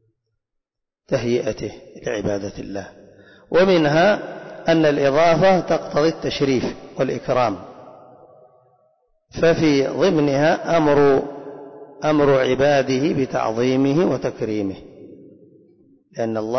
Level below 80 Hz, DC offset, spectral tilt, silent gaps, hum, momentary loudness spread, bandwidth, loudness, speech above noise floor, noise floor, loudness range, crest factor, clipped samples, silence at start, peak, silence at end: -50 dBFS; under 0.1%; -6 dB/octave; none; none; 17 LU; 6.4 kHz; -19 LUFS; 61 dB; -80 dBFS; 6 LU; 12 dB; under 0.1%; 1.1 s; -8 dBFS; 0 s